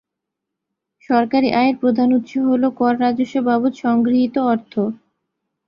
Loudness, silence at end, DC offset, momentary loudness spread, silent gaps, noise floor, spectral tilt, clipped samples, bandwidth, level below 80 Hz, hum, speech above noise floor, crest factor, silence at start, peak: -18 LUFS; 0.75 s; under 0.1%; 5 LU; none; -81 dBFS; -7 dB/octave; under 0.1%; 7 kHz; -60 dBFS; none; 64 dB; 16 dB; 1.1 s; -2 dBFS